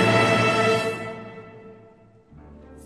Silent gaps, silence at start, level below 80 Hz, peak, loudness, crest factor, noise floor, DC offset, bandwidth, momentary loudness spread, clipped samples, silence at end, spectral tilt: none; 0 s; -56 dBFS; -6 dBFS; -20 LUFS; 18 dB; -52 dBFS; under 0.1%; 14 kHz; 24 LU; under 0.1%; 0.05 s; -5 dB/octave